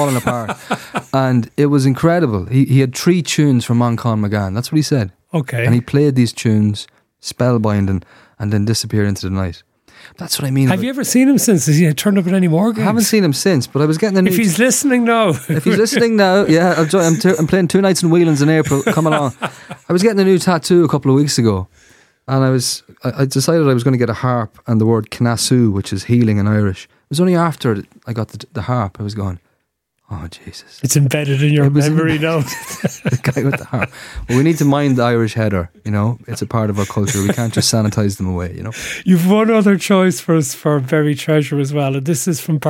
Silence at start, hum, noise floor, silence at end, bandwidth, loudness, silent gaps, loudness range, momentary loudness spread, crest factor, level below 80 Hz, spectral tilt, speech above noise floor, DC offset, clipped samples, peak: 0 s; none; -69 dBFS; 0 s; 17 kHz; -15 LUFS; none; 5 LU; 11 LU; 14 dB; -46 dBFS; -5.5 dB/octave; 54 dB; under 0.1%; under 0.1%; -2 dBFS